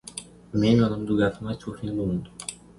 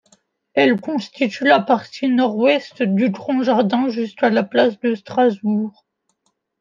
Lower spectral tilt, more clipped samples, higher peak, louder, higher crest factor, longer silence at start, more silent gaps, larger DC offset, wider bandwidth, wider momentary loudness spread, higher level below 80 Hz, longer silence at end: about the same, -6.5 dB/octave vs -6.5 dB/octave; neither; second, -8 dBFS vs 0 dBFS; second, -25 LUFS vs -18 LUFS; about the same, 18 dB vs 18 dB; second, 0.05 s vs 0.55 s; neither; neither; first, 11.5 kHz vs 7.4 kHz; first, 16 LU vs 7 LU; first, -48 dBFS vs -72 dBFS; second, 0.25 s vs 0.9 s